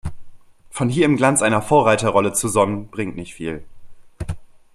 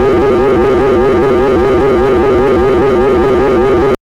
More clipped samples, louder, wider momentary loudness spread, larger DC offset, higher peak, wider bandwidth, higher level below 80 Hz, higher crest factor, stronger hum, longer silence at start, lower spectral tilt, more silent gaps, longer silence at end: neither; second, -18 LUFS vs -9 LUFS; first, 19 LU vs 0 LU; neither; about the same, -2 dBFS vs -2 dBFS; first, 15 kHz vs 10.5 kHz; second, -44 dBFS vs -24 dBFS; first, 18 dB vs 6 dB; neither; about the same, 0.05 s vs 0 s; second, -5 dB/octave vs -7.5 dB/octave; neither; first, 0.3 s vs 0.05 s